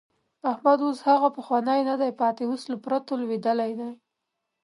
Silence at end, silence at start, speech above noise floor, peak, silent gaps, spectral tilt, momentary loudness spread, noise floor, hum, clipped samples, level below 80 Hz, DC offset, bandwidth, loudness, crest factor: 0.7 s; 0.45 s; 57 dB; -8 dBFS; none; -6 dB/octave; 9 LU; -82 dBFS; none; under 0.1%; -82 dBFS; under 0.1%; 11.5 kHz; -25 LUFS; 18 dB